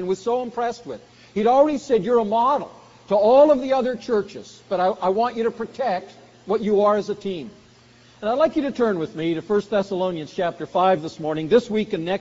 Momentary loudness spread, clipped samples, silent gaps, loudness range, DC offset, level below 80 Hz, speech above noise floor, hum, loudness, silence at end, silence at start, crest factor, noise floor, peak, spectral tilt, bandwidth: 12 LU; under 0.1%; none; 5 LU; under 0.1%; -58 dBFS; 31 dB; none; -21 LUFS; 0 s; 0 s; 16 dB; -51 dBFS; -4 dBFS; -5 dB/octave; 7.6 kHz